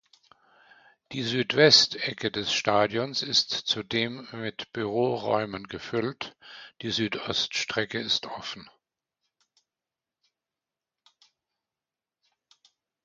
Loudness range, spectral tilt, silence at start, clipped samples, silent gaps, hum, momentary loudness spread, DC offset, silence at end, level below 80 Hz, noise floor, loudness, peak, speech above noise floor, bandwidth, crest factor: 10 LU; -3 dB/octave; 1.1 s; under 0.1%; none; none; 17 LU; under 0.1%; 4.4 s; -66 dBFS; under -90 dBFS; -26 LUFS; -4 dBFS; over 63 dB; 9.2 kHz; 26 dB